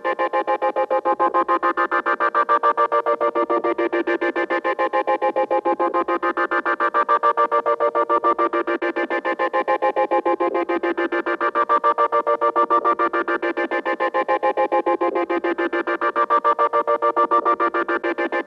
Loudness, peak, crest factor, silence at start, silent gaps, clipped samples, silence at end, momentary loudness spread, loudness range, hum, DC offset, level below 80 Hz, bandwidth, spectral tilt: -20 LUFS; -6 dBFS; 14 dB; 0.05 s; none; under 0.1%; 0 s; 4 LU; 2 LU; none; under 0.1%; -70 dBFS; 6.8 kHz; -5 dB/octave